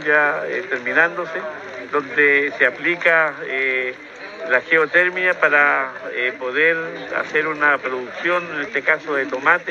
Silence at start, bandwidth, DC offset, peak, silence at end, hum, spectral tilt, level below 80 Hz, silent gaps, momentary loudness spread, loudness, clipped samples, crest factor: 0 s; 9.6 kHz; under 0.1%; -2 dBFS; 0 s; none; -4.5 dB/octave; -68 dBFS; none; 11 LU; -18 LUFS; under 0.1%; 18 dB